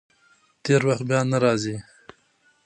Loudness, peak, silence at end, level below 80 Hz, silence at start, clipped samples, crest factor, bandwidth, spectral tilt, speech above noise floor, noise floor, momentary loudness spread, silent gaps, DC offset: -22 LUFS; -6 dBFS; 0.85 s; -64 dBFS; 0.65 s; under 0.1%; 20 dB; 9.8 kHz; -6 dB/octave; 42 dB; -63 dBFS; 13 LU; none; under 0.1%